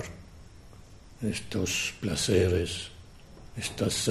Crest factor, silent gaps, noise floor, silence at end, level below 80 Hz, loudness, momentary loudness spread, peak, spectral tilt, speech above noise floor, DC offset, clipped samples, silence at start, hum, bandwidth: 20 dB; none; -50 dBFS; 0 s; -44 dBFS; -29 LUFS; 18 LU; -10 dBFS; -4 dB/octave; 21 dB; under 0.1%; under 0.1%; 0 s; none; 13.5 kHz